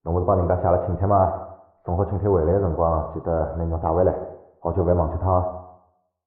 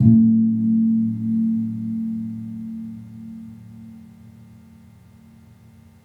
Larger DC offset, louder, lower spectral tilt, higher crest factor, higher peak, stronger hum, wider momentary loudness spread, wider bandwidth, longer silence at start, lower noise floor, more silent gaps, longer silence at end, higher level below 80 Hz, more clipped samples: neither; about the same, -22 LUFS vs -21 LUFS; first, -13 dB/octave vs -11.5 dB/octave; about the same, 16 dB vs 20 dB; second, -6 dBFS vs -2 dBFS; neither; second, 12 LU vs 24 LU; first, 2.4 kHz vs 2.1 kHz; about the same, 0.05 s vs 0 s; first, -62 dBFS vs -48 dBFS; neither; second, 0.55 s vs 1.75 s; first, -40 dBFS vs -60 dBFS; neither